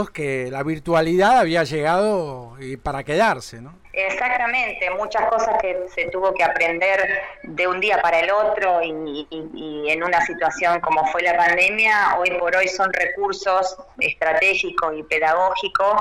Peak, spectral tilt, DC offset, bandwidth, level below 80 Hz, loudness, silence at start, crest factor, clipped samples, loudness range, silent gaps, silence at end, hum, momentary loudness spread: -8 dBFS; -4.5 dB/octave; under 0.1%; 15.5 kHz; -50 dBFS; -19 LUFS; 0 s; 12 dB; under 0.1%; 4 LU; none; 0 s; none; 12 LU